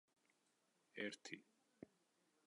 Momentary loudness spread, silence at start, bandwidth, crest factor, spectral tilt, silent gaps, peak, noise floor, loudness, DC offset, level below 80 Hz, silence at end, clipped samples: 16 LU; 0.95 s; 11 kHz; 26 dB; -3.5 dB/octave; none; -32 dBFS; -83 dBFS; -53 LUFS; under 0.1%; under -90 dBFS; 0.6 s; under 0.1%